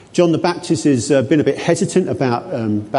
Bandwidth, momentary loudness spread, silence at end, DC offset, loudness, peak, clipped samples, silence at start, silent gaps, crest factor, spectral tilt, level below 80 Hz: 11.5 kHz; 5 LU; 0 s; under 0.1%; -17 LUFS; -2 dBFS; under 0.1%; 0.15 s; none; 14 dB; -6 dB/octave; -52 dBFS